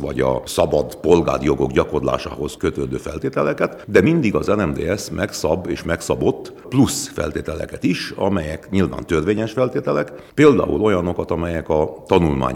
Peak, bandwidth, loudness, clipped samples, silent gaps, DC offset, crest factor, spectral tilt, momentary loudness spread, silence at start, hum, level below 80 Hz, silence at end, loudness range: 0 dBFS; 16.5 kHz; -19 LUFS; under 0.1%; none; under 0.1%; 18 dB; -6 dB/octave; 8 LU; 0 s; none; -38 dBFS; 0 s; 3 LU